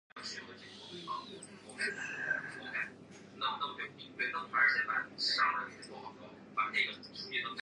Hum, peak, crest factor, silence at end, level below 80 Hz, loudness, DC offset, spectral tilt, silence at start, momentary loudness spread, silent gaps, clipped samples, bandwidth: none; -18 dBFS; 20 dB; 0 s; -80 dBFS; -35 LUFS; under 0.1%; -2 dB/octave; 0.15 s; 20 LU; none; under 0.1%; 11 kHz